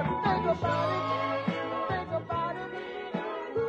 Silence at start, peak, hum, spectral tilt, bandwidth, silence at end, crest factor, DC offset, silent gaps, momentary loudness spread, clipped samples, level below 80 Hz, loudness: 0 s; -14 dBFS; none; -7 dB/octave; 9 kHz; 0 s; 16 dB; under 0.1%; none; 8 LU; under 0.1%; -58 dBFS; -31 LUFS